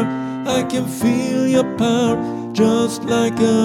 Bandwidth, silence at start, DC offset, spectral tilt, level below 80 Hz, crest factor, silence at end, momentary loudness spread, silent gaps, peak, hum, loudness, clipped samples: 16 kHz; 0 s; under 0.1%; -5.5 dB/octave; -52 dBFS; 14 dB; 0 s; 6 LU; none; -4 dBFS; none; -18 LUFS; under 0.1%